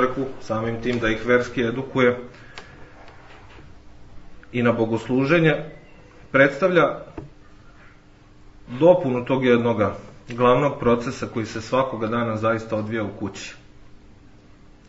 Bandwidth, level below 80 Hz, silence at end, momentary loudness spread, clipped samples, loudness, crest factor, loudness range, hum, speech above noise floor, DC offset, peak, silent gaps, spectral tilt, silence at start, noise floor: 8 kHz; -48 dBFS; 0.6 s; 18 LU; under 0.1%; -21 LUFS; 22 dB; 6 LU; none; 28 dB; under 0.1%; -2 dBFS; none; -6.5 dB/octave; 0 s; -49 dBFS